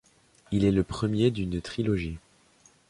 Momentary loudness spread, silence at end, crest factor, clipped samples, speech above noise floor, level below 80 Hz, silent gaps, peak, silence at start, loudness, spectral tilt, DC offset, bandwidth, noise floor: 8 LU; 0.7 s; 20 dB; under 0.1%; 35 dB; -46 dBFS; none; -10 dBFS; 0.5 s; -28 LUFS; -7.5 dB/octave; under 0.1%; 11.5 kHz; -61 dBFS